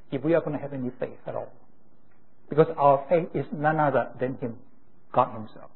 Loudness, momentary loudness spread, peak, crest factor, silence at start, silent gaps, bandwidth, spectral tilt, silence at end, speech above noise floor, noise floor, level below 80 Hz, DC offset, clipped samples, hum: -26 LUFS; 15 LU; -6 dBFS; 22 dB; 0.1 s; none; 4.2 kHz; -11.5 dB/octave; 0.15 s; 38 dB; -63 dBFS; -66 dBFS; 0.8%; under 0.1%; none